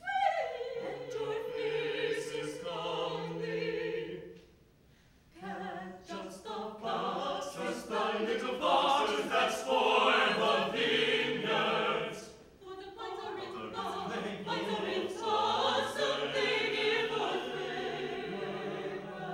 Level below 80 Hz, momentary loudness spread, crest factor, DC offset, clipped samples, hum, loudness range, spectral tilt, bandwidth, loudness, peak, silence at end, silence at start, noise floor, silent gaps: -68 dBFS; 14 LU; 20 dB; under 0.1%; under 0.1%; none; 11 LU; -3.5 dB/octave; 16.5 kHz; -33 LUFS; -14 dBFS; 0 s; 0 s; -63 dBFS; none